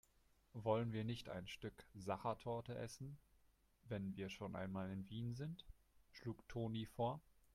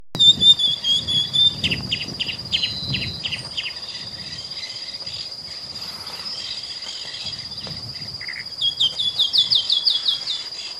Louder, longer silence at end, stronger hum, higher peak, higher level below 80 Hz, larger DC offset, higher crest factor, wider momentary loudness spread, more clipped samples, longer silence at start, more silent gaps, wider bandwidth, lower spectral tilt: second, -48 LUFS vs -19 LUFS; first, 0.35 s vs 0 s; neither; second, -26 dBFS vs -2 dBFS; second, -70 dBFS vs -54 dBFS; neither; about the same, 22 dB vs 20 dB; second, 12 LU vs 15 LU; neither; first, 0.55 s vs 0 s; neither; about the same, 15 kHz vs 15.5 kHz; first, -6.5 dB/octave vs -1.5 dB/octave